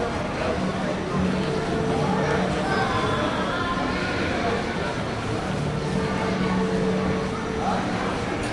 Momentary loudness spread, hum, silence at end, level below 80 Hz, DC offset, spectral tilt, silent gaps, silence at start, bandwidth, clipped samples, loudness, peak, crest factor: 4 LU; none; 0 s; -42 dBFS; under 0.1%; -6 dB/octave; none; 0 s; 11.5 kHz; under 0.1%; -25 LUFS; -10 dBFS; 14 dB